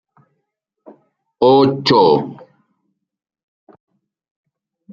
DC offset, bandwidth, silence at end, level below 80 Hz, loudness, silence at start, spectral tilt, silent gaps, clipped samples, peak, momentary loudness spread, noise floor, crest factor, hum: under 0.1%; 7.6 kHz; 2.6 s; -60 dBFS; -13 LUFS; 1.4 s; -7 dB/octave; none; under 0.1%; -2 dBFS; 7 LU; -75 dBFS; 18 dB; none